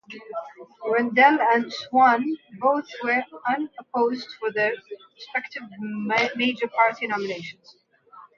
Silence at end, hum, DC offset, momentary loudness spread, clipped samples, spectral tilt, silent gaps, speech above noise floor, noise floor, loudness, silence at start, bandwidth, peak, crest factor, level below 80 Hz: 0.15 s; none; under 0.1%; 18 LU; under 0.1%; -5 dB/octave; none; 27 dB; -50 dBFS; -23 LUFS; 0.1 s; 7.2 kHz; -4 dBFS; 20 dB; -76 dBFS